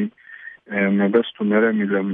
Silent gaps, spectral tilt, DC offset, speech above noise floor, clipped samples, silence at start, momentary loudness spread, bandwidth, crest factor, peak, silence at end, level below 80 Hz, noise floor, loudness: none; -10.5 dB/octave; under 0.1%; 22 dB; under 0.1%; 0 s; 20 LU; 3.8 kHz; 16 dB; -4 dBFS; 0 s; -70 dBFS; -41 dBFS; -20 LUFS